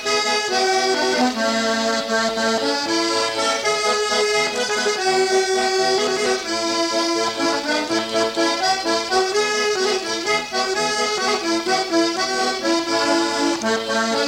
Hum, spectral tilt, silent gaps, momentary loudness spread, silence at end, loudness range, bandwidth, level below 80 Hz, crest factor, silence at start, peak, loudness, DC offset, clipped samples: none; -1.5 dB/octave; none; 2 LU; 0 s; 1 LU; 17 kHz; -58 dBFS; 12 dB; 0 s; -8 dBFS; -19 LUFS; under 0.1%; under 0.1%